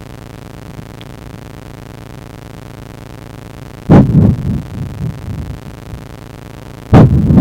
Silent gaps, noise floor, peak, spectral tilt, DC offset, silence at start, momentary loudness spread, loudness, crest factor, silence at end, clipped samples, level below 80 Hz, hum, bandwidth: none; -31 dBFS; 0 dBFS; -9 dB/octave; under 0.1%; 0 s; 24 LU; -11 LUFS; 14 dB; 0 s; 0.9%; -28 dBFS; none; 16 kHz